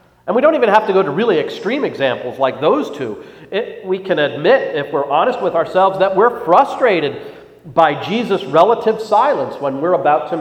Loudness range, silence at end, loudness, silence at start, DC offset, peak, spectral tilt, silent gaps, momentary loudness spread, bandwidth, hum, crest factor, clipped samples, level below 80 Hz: 3 LU; 0 s; -15 LUFS; 0.25 s; under 0.1%; 0 dBFS; -6 dB/octave; none; 10 LU; 13.5 kHz; none; 16 dB; under 0.1%; -58 dBFS